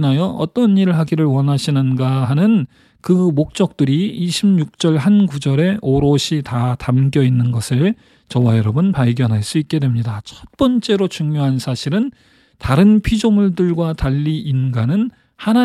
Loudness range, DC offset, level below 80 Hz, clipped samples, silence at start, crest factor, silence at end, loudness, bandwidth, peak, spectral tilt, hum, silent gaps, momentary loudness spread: 2 LU; under 0.1%; -40 dBFS; under 0.1%; 0 s; 14 dB; 0 s; -16 LUFS; 13 kHz; 0 dBFS; -7 dB/octave; none; none; 6 LU